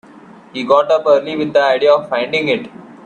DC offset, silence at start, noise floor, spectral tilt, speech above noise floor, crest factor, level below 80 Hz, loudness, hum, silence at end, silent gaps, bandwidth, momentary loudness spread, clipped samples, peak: under 0.1%; 0.55 s; -40 dBFS; -5 dB/octave; 26 dB; 14 dB; -62 dBFS; -14 LUFS; none; 0.1 s; none; 9 kHz; 11 LU; under 0.1%; 0 dBFS